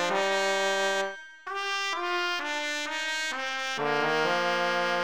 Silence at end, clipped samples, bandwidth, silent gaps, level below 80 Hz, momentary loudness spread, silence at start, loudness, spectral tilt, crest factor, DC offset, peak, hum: 0 s; under 0.1%; over 20 kHz; none; -76 dBFS; 5 LU; 0 s; -28 LUFS; -2 dB/octave; 16 dB; 0.3%; -12 dBFS; none